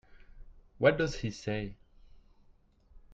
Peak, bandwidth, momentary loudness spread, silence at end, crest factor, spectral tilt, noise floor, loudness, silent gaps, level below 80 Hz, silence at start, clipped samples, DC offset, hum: -10 dBFS; 8 kHz; 11 LU; 0 s; 24 dB; -6 dB/octave; -63 dBFS; -32 LUFS; none; -52 dBFS; 0.1 s; under 0.1%; under 0.1%; none